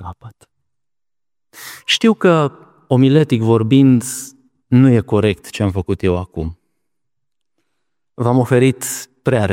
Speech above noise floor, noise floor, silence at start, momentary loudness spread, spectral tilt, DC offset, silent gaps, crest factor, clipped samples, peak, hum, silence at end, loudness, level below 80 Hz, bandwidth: over 76 dB; under -90 dBFS; 0 s; 15 LU; -6 dB/octave; under 0.1%; none; 16 dB; under 0.1%; 0 dBFS; none; 0 s; -15 LUFS; -44 dBFS; 16.5 kHz